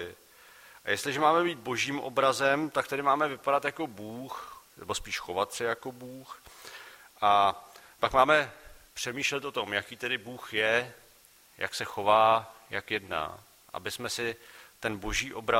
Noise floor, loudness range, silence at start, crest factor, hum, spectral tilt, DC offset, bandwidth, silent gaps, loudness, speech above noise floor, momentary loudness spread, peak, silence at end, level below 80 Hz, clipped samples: -59 dBFS; 6 LU; 0 s; 24 dB; none; -3 dB/octave; under 0.1%; 16 kHz; none; -29 LUFS; 30 dB; 21 LU; -6 dBFS; 0 s; -56 dBFS; under 0.1%